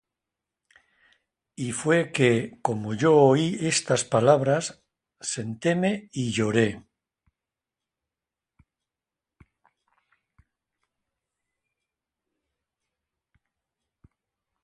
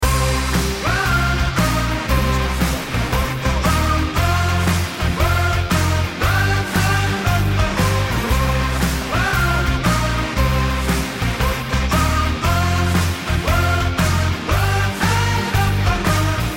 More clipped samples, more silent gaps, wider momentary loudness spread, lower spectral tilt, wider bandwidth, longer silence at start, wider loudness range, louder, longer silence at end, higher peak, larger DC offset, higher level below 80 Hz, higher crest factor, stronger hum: neither; neither; first, 12 LU vs 3 LU; about the same, -5 dB/octave vs -5 dB/octave; second, 11.5 kHz vs 17 kHz; first, 1.6 s vs 0 s; first, 9 LU vs 1 LU; second, -24 LUFS vs -18 LUFS; first, 7.85 s vs 0 s; about the same, -4 dBFS vs -6 dBFS; neither; second, -64 dBFS vs -24 dBFS; first, 24 dB vs 12 dB; neither